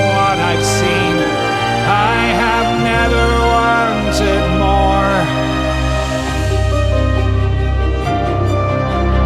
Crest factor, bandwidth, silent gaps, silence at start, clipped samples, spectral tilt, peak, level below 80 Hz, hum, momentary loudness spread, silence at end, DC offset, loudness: 12 dB; 13.5 kHz; none; 0 s; under 0.1%; -5.5 dB/octave; 0 dBFS; -20 dBFS; none; 4 LU; 0 s; under 0.1%; -14 LUFS